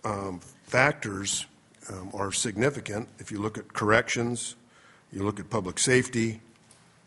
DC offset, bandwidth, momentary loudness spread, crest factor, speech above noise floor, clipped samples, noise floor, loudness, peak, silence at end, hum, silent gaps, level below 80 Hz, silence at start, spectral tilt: under 0.1%; 11.5 kHz; 18 LU; 24 dB; 30 dB; under 0.1%; -58 dBFS; -28 LUFS; -4 dBFS; 0.7 s; none; none; -60 dBFS; 0.05 s; -3.5 dB/octave